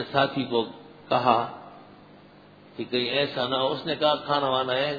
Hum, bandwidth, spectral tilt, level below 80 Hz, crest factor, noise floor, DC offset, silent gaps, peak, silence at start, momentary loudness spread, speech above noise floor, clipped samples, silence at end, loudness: none; 5 kHz; -7 dB/octave; -66 dBFS; 20 dB; -51 dBFS; under 0.1%; none; -6 dBFS; 0 s; 14 LU; 26 dB; under 0.1%; 0 s; -25 LUFS